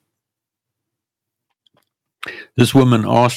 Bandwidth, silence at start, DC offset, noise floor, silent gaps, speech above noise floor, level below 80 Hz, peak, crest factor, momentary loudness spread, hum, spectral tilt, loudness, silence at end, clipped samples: 16 kHz; 2.25 s; under 0.1%; -84 dBFS; none; 70 dB; -52 dBFS; -2 dBFS; 18 dB; 19 LU; none; -6.5 dB/octave; -14 LUFS; 0 s; under 0.1%